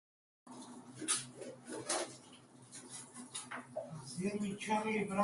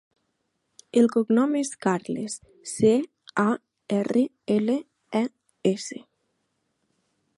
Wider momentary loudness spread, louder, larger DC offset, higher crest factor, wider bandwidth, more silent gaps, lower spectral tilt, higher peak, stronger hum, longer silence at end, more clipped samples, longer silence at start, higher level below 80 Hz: first, 17 LU vs 11 LU; second, -40 LUFS vs -25 LUFS; neither; about the same, 22 dB vs 18 dB; about the same, 11.5 kHz vs 11.5 kHz; neither; second, -3.5 dB/octave vs -5.5 dB/octave; second, -20 dBFS vs -8 dBFS; neither; second, 0 s vs 1.4 s; neither; second, 0.45 s vs 0.95 s; second, -78 dBFS vs -68 dBFS